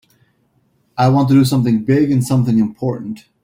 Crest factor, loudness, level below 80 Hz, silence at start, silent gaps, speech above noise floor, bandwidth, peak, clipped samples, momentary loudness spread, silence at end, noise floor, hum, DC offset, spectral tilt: 14 dB; -15 LUFS; -50 dBFS; 0.95 s; none; 46 dB; 16 kHz; -2 dBFS; under 0.1%; 13 LU; 0.25 s; -60 dBFS; none; under 0.1%; -7.5 dB/octave